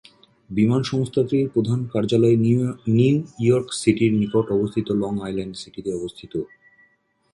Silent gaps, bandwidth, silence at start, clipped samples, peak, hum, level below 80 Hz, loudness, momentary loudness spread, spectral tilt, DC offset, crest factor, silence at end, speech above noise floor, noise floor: none; 11.5 kHz; 0.5 s; under 0.1%; -4 dBFS; none; -54 dBFS; -21 LUFS; 12 LU; -7 dB/octave; under 0.1%; 18 dB; 0.85 s; 42 dB; -63 dBFS